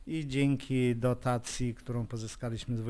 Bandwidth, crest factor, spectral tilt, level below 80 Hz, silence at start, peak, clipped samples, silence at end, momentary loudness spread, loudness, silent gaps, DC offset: 11 kHz; 14 dB; -6 dB/octave; -50 dBFS; 0 s; -18 dBFS; under 0.1%; 0 s; 9 LU; -32 LUFS; none; under 0.1%